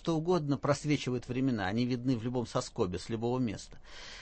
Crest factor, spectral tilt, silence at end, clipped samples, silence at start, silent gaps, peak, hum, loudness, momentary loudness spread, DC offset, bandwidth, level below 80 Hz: 16 dB; -6 dB/octave; 0 s; under 0.1%; 0 s; none; -16 dBFS; none; -33 LUFS; 8 LU; under 0.1%; 8.8 kHz; -56 dBFS